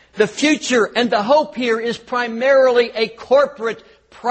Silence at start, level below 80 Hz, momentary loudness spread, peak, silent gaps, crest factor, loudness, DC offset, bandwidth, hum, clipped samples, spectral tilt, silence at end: 0.15 s; -60 dBFS; 10 LU; -2 dBFS; none; 16 dB; -17 LUFS; under 0.1%; 8.8 kHz; none; under 0.1%; -3.5 dB/octave; 0 s